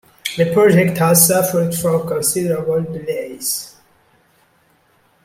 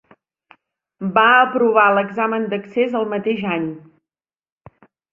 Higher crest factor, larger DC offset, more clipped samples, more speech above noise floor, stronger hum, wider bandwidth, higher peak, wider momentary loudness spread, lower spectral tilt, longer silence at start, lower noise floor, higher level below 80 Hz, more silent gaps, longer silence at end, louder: about the same, 18 dB vs 18 dB; neither; neither; second, 41 dB vs 73 dB; neither; first, 16.5 kHz vs 5.2 kHz; about the same, 0 dBFS vs 0 dBFS; about the same, 13 LU vs 12 LU; second, -4.5 dB/octave vs -7.5 dB/octave; second, 0.25 s vs 1 s; second, -57 dBFS vs -90 dBFS; first, -56 dBFS vs -64 dBFS; neither; first, 1.55 s vs 1.35 s; about the same, -16 LUFS vs -17 LUFS